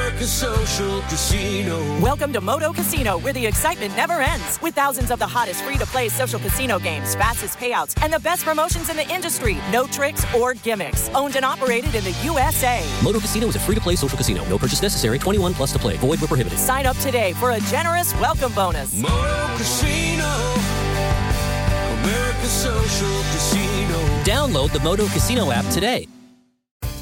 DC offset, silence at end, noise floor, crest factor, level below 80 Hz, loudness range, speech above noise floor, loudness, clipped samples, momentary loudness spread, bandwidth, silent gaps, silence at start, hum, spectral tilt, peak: under 0.1%; 0 s; -52 dBFS; 14 dB; -30 dBFS; 1 LU; 32 dB; -20 LUFS; under 0.1%; 3 LU; 17 kHz; 26.71-26.80 s; 0 s; none; -4 dB/octave; -8 dBFS